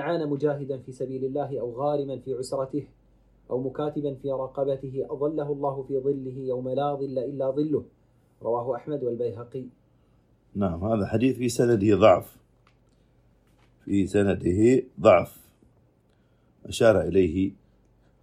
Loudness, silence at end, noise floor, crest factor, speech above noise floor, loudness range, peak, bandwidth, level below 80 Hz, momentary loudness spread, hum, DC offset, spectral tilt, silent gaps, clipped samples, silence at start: -26 LUFS; 0.7 s; -63 dBFS; 22 dB; 38 dB; 7 LU; -4 dBFS; 16 kHz; -56 dBFS; 14 LU; none; under 0.1%; -7 dB/octave; none; under 0.1%; 0 s